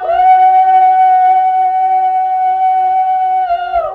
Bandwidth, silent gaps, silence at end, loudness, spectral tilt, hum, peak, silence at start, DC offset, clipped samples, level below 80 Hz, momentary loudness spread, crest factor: 4.4 kHz; none; 0 s; -10 LUFS; -4.5 dB/octave; none; -2 dBFS; 0 s; under 0.1%; under 0.1%; -48 dBFS; 6 LU; 8 dB